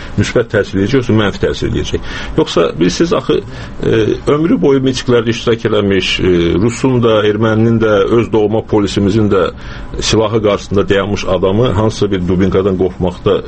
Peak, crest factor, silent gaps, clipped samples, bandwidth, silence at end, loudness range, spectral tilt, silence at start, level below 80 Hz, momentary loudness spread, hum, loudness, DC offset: 0 dBFS; 12 dB; none; under 0.1%; 8.8 kHz; 0 s; 2 LU; -6 dB/octave; 0 s; -30 dBFS; 6 LU; none; -13 LUFS; under 0.1%